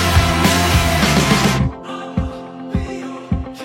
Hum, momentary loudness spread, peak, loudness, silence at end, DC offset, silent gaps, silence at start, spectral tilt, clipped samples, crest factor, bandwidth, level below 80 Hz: none; 14 LU; -2 dBFS; -16 LUFS; 0 s; under 0.1%; none; 0 s; -4.5 dB/octave; under 0.1%; 16 dB; 16.5 kHz; -26 dBFS